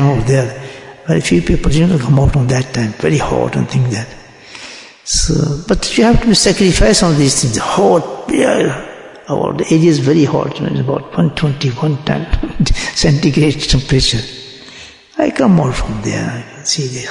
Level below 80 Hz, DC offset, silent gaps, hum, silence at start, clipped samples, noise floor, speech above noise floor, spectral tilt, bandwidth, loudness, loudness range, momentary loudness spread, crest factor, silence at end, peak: -26 dBFS; under 0.1%; none; none; 0 s; under 0.1%; -36 dBFS; 23 dB; -5 dB/octave; 11 kHz; -13 LUFS; 4 LU; 17 LU; 14 dB; 0 s; 0 dBFS